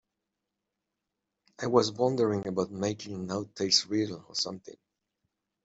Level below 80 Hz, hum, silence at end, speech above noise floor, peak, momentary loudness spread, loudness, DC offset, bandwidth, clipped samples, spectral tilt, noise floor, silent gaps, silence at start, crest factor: -70 dBFS; none; 0.9 s; 56 dB; -8 dBFS; 11 LU; -29 LUFS; under 0.1%; 8 kHz; under 0.1%; -4 dB/octave; -86 dBFS; none; 1.6 s; 24 dB